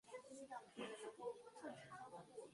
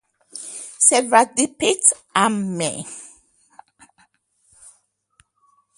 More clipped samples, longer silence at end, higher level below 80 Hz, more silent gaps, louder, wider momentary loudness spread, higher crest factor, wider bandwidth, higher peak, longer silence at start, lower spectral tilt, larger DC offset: neither; second, 0 s vs 2.7 s; second, under -90 dBFS vs -66 dBFS; neither; second, -55 LUFS vs -17 LUFS; second, 5 LU vs 20 LU; about the same, 18 dB vs 22 dB; about the same, 11.5 kHz vs 11.5 kHz; second, -38 dBFS vs 0 dBFS; second, 0.05 s vs 0.35 s; first, -4 dB/octave vs -2 dB/octave; neither